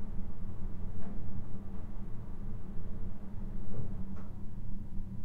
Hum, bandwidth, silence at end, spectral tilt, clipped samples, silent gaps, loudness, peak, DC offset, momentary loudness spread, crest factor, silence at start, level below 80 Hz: none; 2.2 kHz; 0 s; -9.5 dB/octave; under 0.1%; none; -45 LUFS; -18 dBFS; under 0.1%; 3 LU; 10 dB; 0 s; -40 dBFS